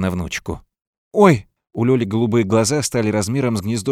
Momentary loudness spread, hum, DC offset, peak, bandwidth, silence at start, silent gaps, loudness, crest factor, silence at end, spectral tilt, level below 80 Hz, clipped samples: 12 LU; none; under 0.1%; 0 dBFS; 15.5 kHz; 0 s; 0.87-1.11 s; -18 LUFS; 18 dB; 0 s; -5.5 dB/octave; -46 dBFS; under 0.1%